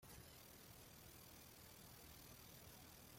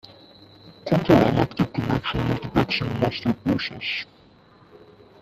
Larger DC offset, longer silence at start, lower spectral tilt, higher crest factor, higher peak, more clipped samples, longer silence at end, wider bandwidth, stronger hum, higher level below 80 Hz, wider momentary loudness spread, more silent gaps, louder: neither; second, 0 s vs 0.65 s; second, -3 dB/octave vs -7.5 dB/octave; second, 14 dB vs 22 dB; second, -48 dBFS vs -2 dBFS; neither; second, 0 s vs 1.15 s; first, 16.5 kHz vs 14 kHz; neither; second, -74 dBFS vs -46 dBFS; second, 1 LU vs 10 LU; neither; second, -61 LUFS vs -23 LUFS